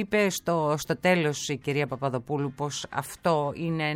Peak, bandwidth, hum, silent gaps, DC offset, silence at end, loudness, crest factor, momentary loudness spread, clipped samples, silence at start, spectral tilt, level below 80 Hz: -10 dBFS; 16.5 kHz; none; none; under 0.1%; 0 s; -27 LUFS; 18 dB; 7 LU; under 0.1%; 0 s; -5 dB/octave; -60 dBFS